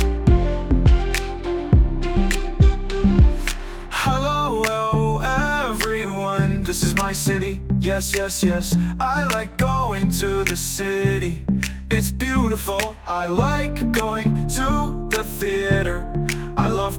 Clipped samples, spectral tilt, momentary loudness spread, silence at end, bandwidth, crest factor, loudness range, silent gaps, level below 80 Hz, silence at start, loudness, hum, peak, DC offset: under 0.1%; -5.5 dB/octave; 6 LU; 0 s; 19.5 kHz; 18 dB; 2 LU; none; -24 dBFS; 0 s; -21 LUFS; none; -2 dBFS; under 0.1%